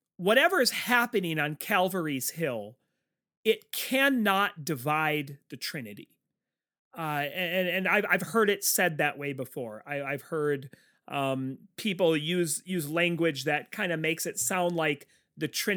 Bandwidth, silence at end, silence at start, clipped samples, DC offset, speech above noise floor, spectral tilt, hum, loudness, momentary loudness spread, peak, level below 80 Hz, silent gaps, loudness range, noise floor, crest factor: over 20 kHz; 0 s; 0.2 s; under 0.1%; under 0.1%; 60 dB; -3.5 dB/octave; none; -28 LUFS; 12 LU; -8 dBFS; -78 dBFS; 3.37-3.44 s, 6.79-6.91 s; 4 LU; -89 dBFS; 20 dB